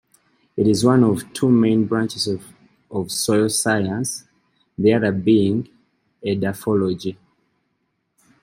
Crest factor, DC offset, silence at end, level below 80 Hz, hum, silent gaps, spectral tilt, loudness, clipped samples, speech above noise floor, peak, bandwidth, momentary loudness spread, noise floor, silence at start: 18 dB; under 0.1%; 1.3 s; -58 dBFS; none; none; -5.5 dB/octave; -19 LUFS; under 0.1%; 53 dB; -2 dBFS; 15.5 kHz; 14 LU; -71 dBFS; 0.55 s